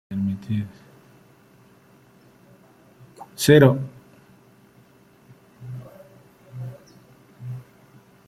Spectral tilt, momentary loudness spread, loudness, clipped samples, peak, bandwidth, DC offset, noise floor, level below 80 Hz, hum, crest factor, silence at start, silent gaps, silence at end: -6 dB/octave; 29 LU; -19 LUFS; under 0.1%; -2 dBFS; 15.5 kHz; under 0.1%; -54 dBFS; -60 dBFS; none; 24 dB; 0.1 s; none; 0.65 s